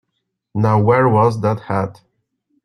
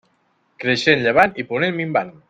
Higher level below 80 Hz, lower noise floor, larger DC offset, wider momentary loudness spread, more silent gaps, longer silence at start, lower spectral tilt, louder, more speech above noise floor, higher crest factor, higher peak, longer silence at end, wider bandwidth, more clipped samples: about the same, -52 dBFS vs -56 dBFS; first, -74 dBFS vs -64 dBFS; neither; first, 11 LU vs 7 LU; neither; about the same, 0.55 s vs 0.6 s; first, -9 dB/octave vs -5 dB/octave; about the same, -16 LUFS vs -18 LUFS; first, 59 dB vs 45 dB; about the same, 16 dB vs 18 dB; about the same, -2 dBFS vs -2 dBFS; first, 0.75 s vs 0.2 s; second, 9.8 kHz vs 14 kHz; neither